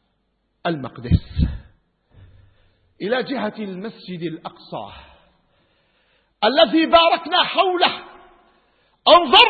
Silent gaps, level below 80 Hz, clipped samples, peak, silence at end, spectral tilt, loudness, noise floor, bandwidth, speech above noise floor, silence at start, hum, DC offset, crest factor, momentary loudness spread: none; -36 dBFS; under 0.1%; 0 dBFS; 0 s; -7 dB/octave; -18 LUFS; -69 dBFS; 6.4 kHz; 51 dB; 0.65 s; none; under 0.1%; 20 dB; 19 LU